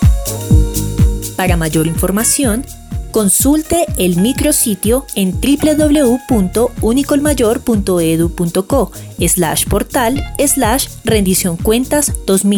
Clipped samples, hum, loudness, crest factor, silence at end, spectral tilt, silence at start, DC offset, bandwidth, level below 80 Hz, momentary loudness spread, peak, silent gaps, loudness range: under 0.1%; none; -13 LUFS; 12 dB; 0 s; -4.5 dB/octave; 0 s; under 0.1%; over 20 kHz; -22 dBFS; 5 LU; 0 dBFS; none; 1 LU